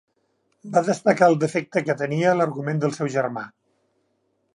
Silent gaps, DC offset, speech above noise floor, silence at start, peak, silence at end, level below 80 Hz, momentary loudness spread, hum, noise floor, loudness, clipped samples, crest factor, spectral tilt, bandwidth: none; under 0.1%; 49 dB; 0.65 s; -2 dBFS; 1.1 s; -72 dBFS; 8 LU; none; -70 dBFS; -22 LUFS; under 0.1%; 20 dB; -6.5 dB/octave; 11.5 kHz